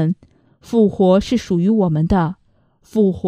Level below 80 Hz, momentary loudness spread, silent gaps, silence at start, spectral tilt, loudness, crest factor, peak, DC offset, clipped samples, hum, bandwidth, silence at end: -40 dBFS; 10 LU; none; 0 s; -8 dB/octave; -17 LUFS; 16 dB; -2 dBFS; under 0.1%; under 0.1%; none; 9.8 kHz; 0 s